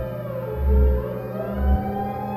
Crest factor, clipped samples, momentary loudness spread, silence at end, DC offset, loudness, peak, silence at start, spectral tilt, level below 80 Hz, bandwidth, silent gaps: 14 dB; under 0.1%; 9 LU; 0 s; under 0.1%; -24 LUFS; -8 dBFS; 0 s; -10.5 dB/octave; -24 dBFS; 13 kHz; none